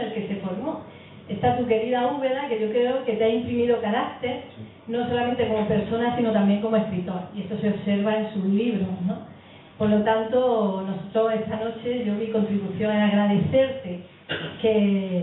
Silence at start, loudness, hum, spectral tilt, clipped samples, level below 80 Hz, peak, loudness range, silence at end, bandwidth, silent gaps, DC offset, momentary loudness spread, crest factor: 0 s; -24 LUFS; none; -11.5 dB/octave; under 0.1%; -58 dBFS; -8 dBFS; 1 LU; 0 s; 4.1 kHz; none; under 0.1%; 11 LU; 16 dB